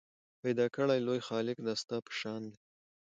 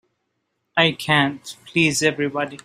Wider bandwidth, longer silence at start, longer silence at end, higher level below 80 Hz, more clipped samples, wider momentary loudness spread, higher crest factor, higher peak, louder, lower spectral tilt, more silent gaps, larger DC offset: second, 9.2 kHz vs 15.5 kHz; second, 0.45 s vs 0.75 s; first, 0.5 s vs 0.1 s; second, -80 dBFS vs -60 dBFS; neither; about the same, 10 LU vs 8 LU; about the same, 18 dB vs 20 dB; second, -18 dBFS vs -2 dBFS; second, -35 LUFS vs -19 LUFS; first, -5.5 dB/octave vs -3.5 dB/octave; neither; neither